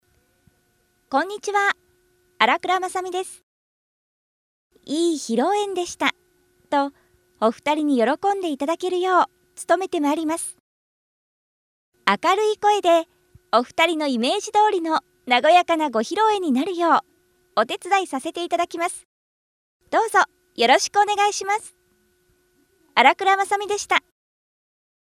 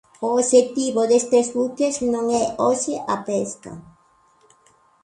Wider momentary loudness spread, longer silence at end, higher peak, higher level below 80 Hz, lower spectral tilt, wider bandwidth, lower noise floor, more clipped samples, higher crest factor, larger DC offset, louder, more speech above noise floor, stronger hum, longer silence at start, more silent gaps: about the same, 9 LU vs 10 LU; about the same, 1.2 s vs 1.2 s; about the same, 0 dBFS vs -2 dBFS; second, -70 dBFS vs -60 dBFS; second, -2.5 dB/octave vs -4 dB/octave; first, 15 kHz vs 11 kHz; first, -65 dBFS vs -58 dBFS; neither; about the same, 22 dB vs 18 dB; neither; about the same, -21 LUFS vs -20 LUFS; first, 45 dB vs 38 dB; neither; first, 1.1 s vs 0.2 s; first, 3.43-4.70 s, 10.60-11.92 s, 19.05-19.80 s vs none